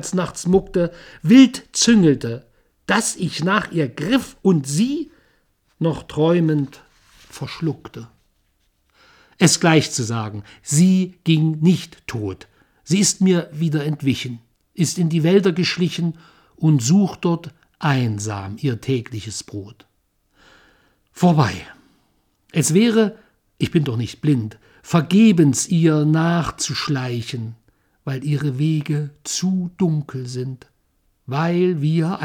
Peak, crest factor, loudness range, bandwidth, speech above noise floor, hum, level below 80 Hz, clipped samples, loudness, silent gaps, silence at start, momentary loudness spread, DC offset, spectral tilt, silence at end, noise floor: 0 dBFS; 20 dB; 6 LU; 16.5 kHz; 47 dB; none; -52 dBFS; under 0.1%; -19 LUFS; none; 0 s; 15 LU; under 0.1%; -5.5 dB/octave; 0 s; -65 dBFS